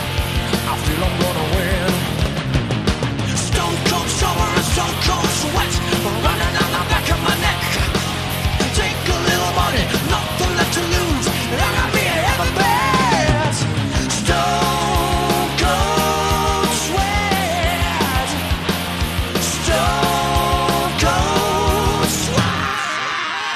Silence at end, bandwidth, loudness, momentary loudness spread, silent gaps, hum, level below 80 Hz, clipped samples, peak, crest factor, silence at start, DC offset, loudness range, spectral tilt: 0 s; 14 kHz; -18 LUFS; 4 LU; none; none; -28 dBFS; under 0.1%; 0 dBFS; 18 dB; 0 s; under 0.1%; 2 LU; -4 dB/octave